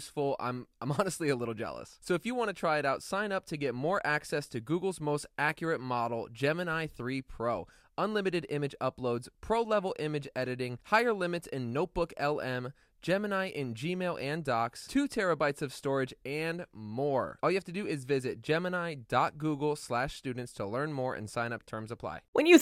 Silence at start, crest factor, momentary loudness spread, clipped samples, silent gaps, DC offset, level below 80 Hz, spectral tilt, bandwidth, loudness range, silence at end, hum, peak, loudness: 0 s; 26 dB; 8 LU; under 0.1%; 22.28-22.33 s; under 0.1%; -60 dBFS; -5.5 dB/octave; 15 kHz; 2 LU; 0 s; none; -6 dBFS; -33 LUFS